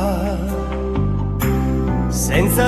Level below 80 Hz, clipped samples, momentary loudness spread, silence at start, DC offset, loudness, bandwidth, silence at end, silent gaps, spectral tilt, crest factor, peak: -24 dBFS; under 0.1%; 6 LU; 0 s; under 0.1%; -20 LUFS; 14 kHz; 0 s; none; -6 dB/octave; 14 dB; -4 dBFS